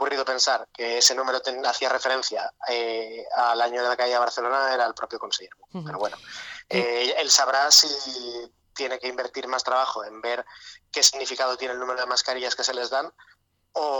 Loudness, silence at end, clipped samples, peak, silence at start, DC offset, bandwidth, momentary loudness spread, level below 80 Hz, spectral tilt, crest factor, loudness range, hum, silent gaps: -23 LUFS; 0 s; under 0.1%; -6 dBFS; 0 s; under 0.1%; 19 kHz; 15 LU; -70 dBFS; 0 dB/octave; 18 dB; 5 LU; none; none